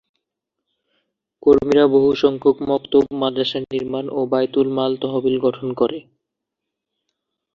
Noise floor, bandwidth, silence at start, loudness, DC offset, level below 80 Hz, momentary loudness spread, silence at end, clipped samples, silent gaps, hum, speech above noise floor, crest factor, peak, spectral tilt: -82 dBFS; 6.8 kHz; 1.45 s; -18 LUFS; under 0.1%; -54 dBFS; 9 LU; 1.55 s; under 0.1%; none; none; 64 dB; 18 dB; -2 dBFS; -7 dB/octave